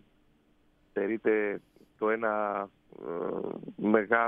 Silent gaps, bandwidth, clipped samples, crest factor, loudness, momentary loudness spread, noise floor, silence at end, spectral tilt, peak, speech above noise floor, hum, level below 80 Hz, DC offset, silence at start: none; 3.8 kHz; under 0.1%; 22 dB; -31 LUFS; 12 LU; -66 dBFS; 0 s; -9.5 dB/octave; -10 dBFS; 36 dB; none; -72 dBFS; under 0.1%; 0.95 s